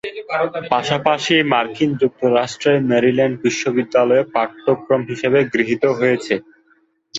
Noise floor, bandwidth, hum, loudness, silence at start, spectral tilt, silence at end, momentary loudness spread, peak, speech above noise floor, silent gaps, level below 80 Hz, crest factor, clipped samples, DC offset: -59 dBFS; 8 kHz; none; -17 LUFS; 0.05 s; -5 dB/octave; 0 s; 6 LU; -2 dBFS; 42 dB; none; -60 dBFS; 16 dB; under 0.1%; under 0.1%